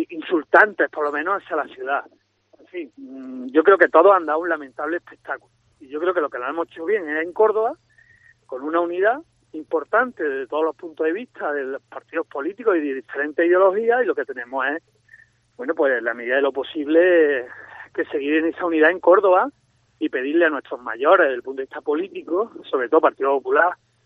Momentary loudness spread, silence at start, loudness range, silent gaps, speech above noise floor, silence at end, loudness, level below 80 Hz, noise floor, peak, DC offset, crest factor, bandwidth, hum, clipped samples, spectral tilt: 17 LU; 0 s; 5 LU; none; 35 dB; 0.3 s; -20 LUFS; -74 dBFS; -55 dBFS; 0 dBFS; under 0.1%; 20 dB; 5 kHz; none; under 0.1%; -6 dB/octave